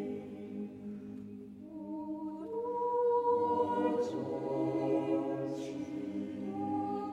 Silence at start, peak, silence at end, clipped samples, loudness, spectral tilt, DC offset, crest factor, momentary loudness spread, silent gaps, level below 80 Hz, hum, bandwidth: 0 s; -20 dBFS; 0 s; under 0.1%; -35 LUFS; -8 dB/octave; under 0.1%; 16 dB; 15 LU; none; -74 dBFS; none; 10 kHz